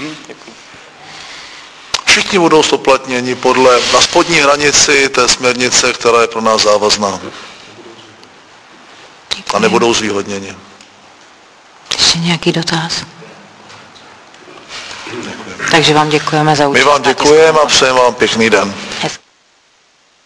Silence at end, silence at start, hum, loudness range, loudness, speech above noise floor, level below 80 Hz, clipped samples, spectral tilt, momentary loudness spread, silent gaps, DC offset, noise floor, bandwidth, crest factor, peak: 1.1 s; 0 s; none; 8 LU; -10 LUFS; 41 dB; -44 dBFS; 0.2%; -2.5 dB/octave; 21 LU; none; under 0.1%; -51 dBFS; 11 kHz; 12 dB; 0 dBFS